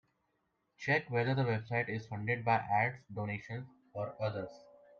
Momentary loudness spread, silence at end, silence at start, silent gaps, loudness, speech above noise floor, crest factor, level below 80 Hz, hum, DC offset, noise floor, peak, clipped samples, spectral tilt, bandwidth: 12 LU; 0.35 s; 0.8 s; none; -35 LUFS; 45 dB; 18 dB; -72 dBFS; none; under 0.1%; -80 dBFS; -18 dBFS; under 0.1%; -7.5 dB/octave; 7 kHz